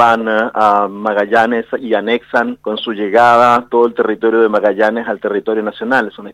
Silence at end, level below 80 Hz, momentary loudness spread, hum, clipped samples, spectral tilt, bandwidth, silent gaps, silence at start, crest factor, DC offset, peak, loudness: 0 s; -58 dBFS; 9 LU; none; under 0.1%; -5.5 dB/octave; 11.5 kHz; none; 0 s; 12 dB; under 0.1%; 0 dBFS; -13 LUFS